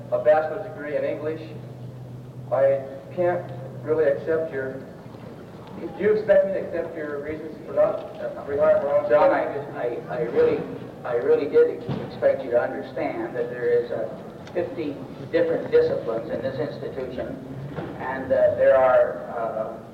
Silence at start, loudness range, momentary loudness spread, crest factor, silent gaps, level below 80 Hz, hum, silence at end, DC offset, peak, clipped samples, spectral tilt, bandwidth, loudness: 0 s; 4 LU; 17 LU; 14 dB; none; -58 dBFS; none; 0 s; under 0.1%; -10 dBFS; under 0.1%; -8 dB/octave; 7.2 kHz; -24 LUFS